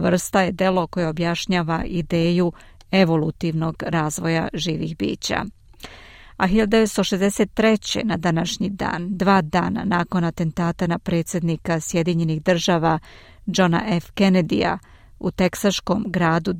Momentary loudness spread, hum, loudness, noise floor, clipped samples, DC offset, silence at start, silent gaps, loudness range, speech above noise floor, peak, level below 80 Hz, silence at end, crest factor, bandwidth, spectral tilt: 7 LU; none; -21 LUFS; -43 dBFS; under 0.1%; under 0.1%; 0 s; none; 2 LU; 23 dB; -4 dBFS; -44 dBFS; 0 s; 18 dB; 16 kHz; -5.5 dB/octave